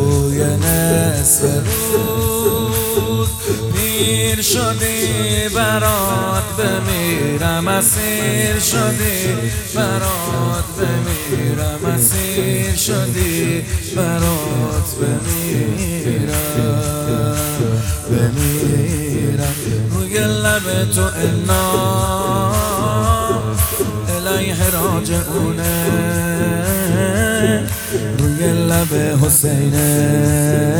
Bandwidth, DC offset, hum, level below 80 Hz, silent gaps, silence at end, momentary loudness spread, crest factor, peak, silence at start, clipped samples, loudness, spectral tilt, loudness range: over 20 kHz; under 0.1%; none; -32 dBFS; none; 0 s; 5 LU; 16 dB; 0 dBFS; 0 s; under 0.1%; -16 LUFS; -4.5 dB/octave; 3 LU